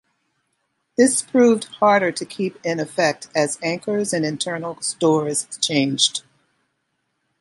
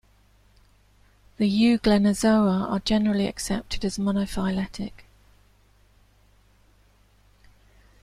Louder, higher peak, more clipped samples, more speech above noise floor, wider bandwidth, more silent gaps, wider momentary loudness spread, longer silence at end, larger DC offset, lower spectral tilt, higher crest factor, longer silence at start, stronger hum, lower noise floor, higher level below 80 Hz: first, -20 LUFS vs -23 LUFS; first, -2 dBFS vs -8 dBFS; neither; first, 53 dB vs 36 dB; second, 11.5 kHz vs 13 kHz; neither; about the same, 9 LU vs 10 LU; second, 1.2 s vs 3 s; neither; second, -3.5 dB/octave vs -5.5 dB/octave; about the same, 20 dB vs 18 dB; second, 1 s vs 1.4 s; second, none vs 50 Hz at -45 dBFS; first, -73 dBFS vs -59 dBFS; second, -70 dBFS vs -46 dBFS